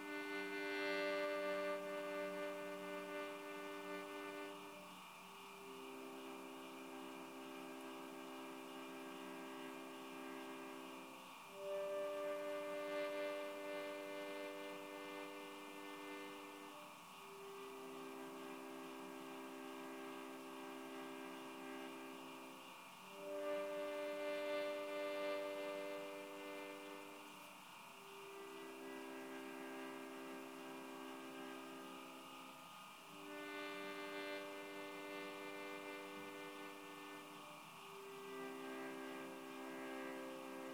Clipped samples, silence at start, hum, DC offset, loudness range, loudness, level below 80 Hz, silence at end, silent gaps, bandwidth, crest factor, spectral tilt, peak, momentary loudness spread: under 0.1%; 0 s; none; under 0.1%; 7 LU; -49 LUFS; under -90 dBFS; 0 s; none; 19 kHz; 20 dB; -3.5 dB/octave; -30 dBFS; 11 LU